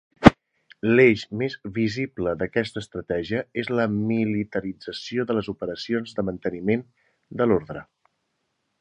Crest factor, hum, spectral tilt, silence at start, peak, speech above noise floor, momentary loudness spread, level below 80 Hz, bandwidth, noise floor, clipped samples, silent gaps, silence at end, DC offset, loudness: 24 dB; none; -7 dB/octave; 0.2 s; 0 dBFS; 51 dB; 14 LU; -48 dBFS; 9.8 kHz; -75 dBFS; under 0.1%; none; 1 s; under 0.1%; -24 LUFS